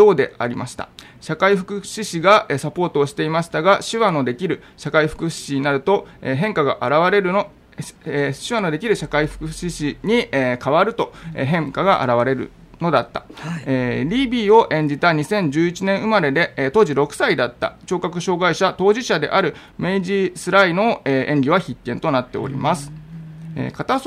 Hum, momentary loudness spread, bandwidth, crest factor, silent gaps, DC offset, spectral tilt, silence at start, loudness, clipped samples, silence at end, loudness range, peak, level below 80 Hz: none; 12 LU; 14.5 kHz; 18 dB; none; under 0.1%; -5.5 dB/octave; 0 s; -19 LUFS; under 0.1%; 0 s; 3 LU; -2 dBFS; -48 dBFS